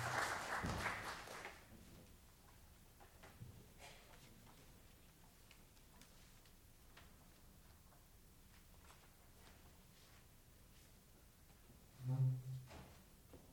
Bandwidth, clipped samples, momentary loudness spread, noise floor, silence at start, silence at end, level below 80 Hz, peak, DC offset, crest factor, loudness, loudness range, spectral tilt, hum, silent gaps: over 20 kHz; under 0.1%; 23 LU; -66 dBFS; 0 s; 0 s; -66 dBFS; -28 dBFS; under 0.1%; 22 dB; -46 LUFS; 16 LU; -4.5 dB/octave; none; none